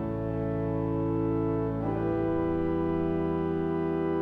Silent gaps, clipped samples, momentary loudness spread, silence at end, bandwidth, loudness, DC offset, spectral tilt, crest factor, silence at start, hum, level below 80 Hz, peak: none; under 0.1%; 2 LU; 0 s; 4.2 kHz; -29 LUFS; under 0.1%; -11 dB/octave; 12 dB; 0 s; none; -46 dBFS; -16 dBFS